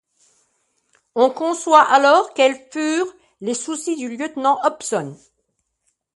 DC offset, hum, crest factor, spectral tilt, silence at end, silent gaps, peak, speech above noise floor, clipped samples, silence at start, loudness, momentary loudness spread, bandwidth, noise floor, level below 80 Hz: under 0.1%; none; 20 dB; -3 dB/octave; 1 s; none; 0 dBFS; 54 dB; under 0.1%; 1.15 s; -18 LUFS; 14 LU; 11.5 kHz; -72 dBFS; -72 dBFS